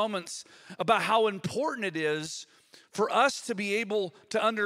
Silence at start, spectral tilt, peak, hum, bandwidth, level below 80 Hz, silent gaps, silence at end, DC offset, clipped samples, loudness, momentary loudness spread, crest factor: 0 s; -3.5 dB/octave; -8 dBFS; none; 15.5 kHz; -76 dBFS; none; 0 s; under 0.1%; under 0.1%; -29 LUFS; 15 LU; 20 dB